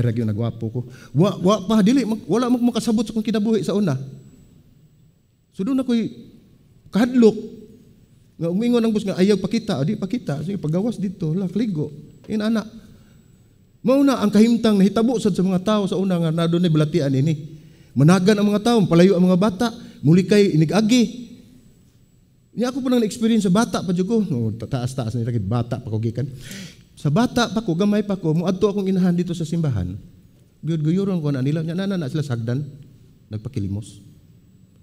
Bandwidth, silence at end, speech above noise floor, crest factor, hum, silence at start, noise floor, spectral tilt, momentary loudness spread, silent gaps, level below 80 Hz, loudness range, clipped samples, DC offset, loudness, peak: 15 kHz; 0.85 s; 38 dB; 20 dB; none; 0 s; -57 dBFS; -7 dB/octave; 13 LU; none; -52 dBFS; 7 LU; under 0.1%; under 0.1%; -20 LUFS; 0 dBFS